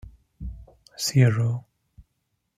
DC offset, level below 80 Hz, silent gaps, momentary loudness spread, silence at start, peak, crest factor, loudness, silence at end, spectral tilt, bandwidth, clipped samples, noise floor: under 0.1%; -46 dBFS; none; 21 LU; 0.05 s; -6 dBFS; 20 dB; -23 LUFS; 0.95 s; -5.5 dB/octave; 15.5 kHz; under 0.1%; -76 dBFS